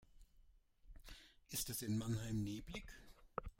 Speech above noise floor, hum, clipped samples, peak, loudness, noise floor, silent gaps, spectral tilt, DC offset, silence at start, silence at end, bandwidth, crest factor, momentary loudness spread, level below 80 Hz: 25 dB; none; under 0.1%; -26 dBFS; -45 LUFS; -69 dBFS; none; -4.5 dB/octave; under 0.1%; 0 s; 0.05 s; 16.5 kHz; 22 dB; 19 LU; -60 dBFS